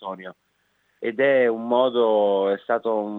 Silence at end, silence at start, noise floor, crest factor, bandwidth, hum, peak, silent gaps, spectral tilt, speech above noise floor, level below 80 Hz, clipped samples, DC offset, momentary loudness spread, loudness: 0 s; 0 s; -68 dBFS; 16 dB; 4.1 kHz; none; -6 dBFS; none; -7.5 dB/octave; 47 dB; -84 dBFS; under 0.1%; under 0.1%; 15 LU; -21 LUFS